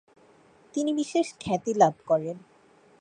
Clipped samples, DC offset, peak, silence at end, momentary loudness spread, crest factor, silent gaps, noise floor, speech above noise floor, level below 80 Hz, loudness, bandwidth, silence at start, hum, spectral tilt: under 0.1%; under 0.1%; -6 dBFS; 0.6 s; 13 LU; 22 dB; none; -58 dBFS; 33 dB; -64 dBFS; -27 LUFS; 10 kHz; 0.75 s; none; -5.5 dB/octave